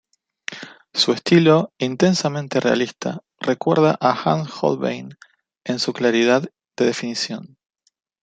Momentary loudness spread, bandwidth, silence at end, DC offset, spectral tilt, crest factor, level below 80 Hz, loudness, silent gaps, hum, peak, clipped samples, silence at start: 17 LU; 9.2 kHz; 0.75 s; under 0.1%; -5 dB/octave; 18 dB; -64 dBFS; -19 LUFS; none; none; -2 dBFS; under 0.1%; 0.5 s